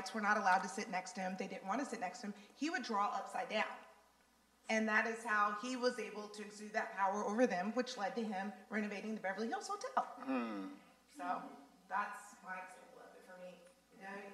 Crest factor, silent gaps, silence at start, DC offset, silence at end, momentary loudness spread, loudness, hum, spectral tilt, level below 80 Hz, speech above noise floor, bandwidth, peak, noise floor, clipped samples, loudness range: 22 dB; none; 0 s; under 0.1%; 0 s; 20 LU; -40 LUFS; none; -4 dB/octave; -88 dBFS; 32 dB; 14 kHz; -20 dBFS; -72 dBFS; under 0.1%; 7 LU